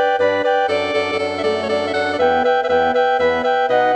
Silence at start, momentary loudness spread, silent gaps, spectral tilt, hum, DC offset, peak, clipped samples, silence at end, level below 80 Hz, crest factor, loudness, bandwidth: 0 s; 4 LU; none; -4.5 dB/octave; none; under 0.1%; -4 dBFS; under 0.1%; 0 s; -48 dBFS; 12 dB; -17 LUFS; 9.2 kHz